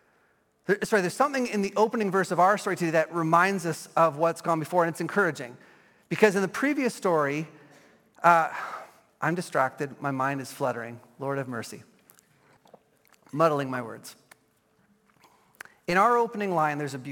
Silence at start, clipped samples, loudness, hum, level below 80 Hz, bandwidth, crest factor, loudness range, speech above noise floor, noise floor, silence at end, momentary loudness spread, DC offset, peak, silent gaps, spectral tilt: 0.7 s; under 0.1%; -26 LUFS; none; -74 dBFS; 17.5 kHz; 22 dB; 8 LU; 41 dB; -67 dBFS; 0 s; 16 LU; under 0.1%; -4 dBFS; none; -5.5 dB/octave